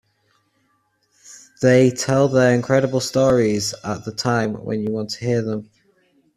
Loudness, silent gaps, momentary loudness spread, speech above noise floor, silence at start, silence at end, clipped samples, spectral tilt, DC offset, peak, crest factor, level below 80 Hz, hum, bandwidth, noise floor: -19 LUFS; none; 9 LU; 47 dB; 1.3 s; 0.75 s; under 0.1%; -5.5 dB/octave; under 0.1%; -2 dBFS; 18 dB; -54 dBFS; none; 14 kHz; -66 dBFS